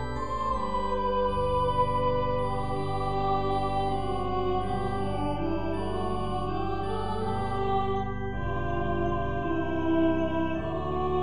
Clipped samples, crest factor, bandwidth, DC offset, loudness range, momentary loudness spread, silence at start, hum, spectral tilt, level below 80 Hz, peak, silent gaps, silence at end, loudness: under 0.1%; 14 dB; 10 kHz; 2%; 3 LU; 5 LU; 0 s; none; -7.5 dB/octave; -40 dBFS; -14 dBFS; none; 0 s; -29 LUFS